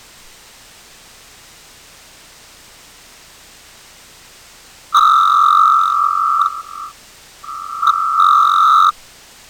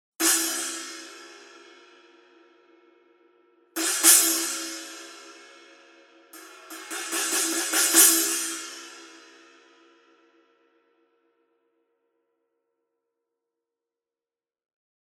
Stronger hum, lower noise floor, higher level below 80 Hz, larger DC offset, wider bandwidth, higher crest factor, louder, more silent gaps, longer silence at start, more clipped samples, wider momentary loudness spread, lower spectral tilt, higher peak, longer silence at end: neither; second, -43 dBFS vs under -90 dBFS; first, -56 dBFS vs under -90 dBFS; neither; first, over 20 kHz vs 17.5 kHz; second, 14 dB vs 28 dB; first, -12 LUFS vs -20 LUFS; neither; first, 4.9 s vs 0.2 s; neither; second, 21 LU vs 27 LU; first, 0.5 dB/octave vs 3 dB/octave; about the same, -2 dBFS vs -2 dBFS; second, 0.6 s vs 5.95 s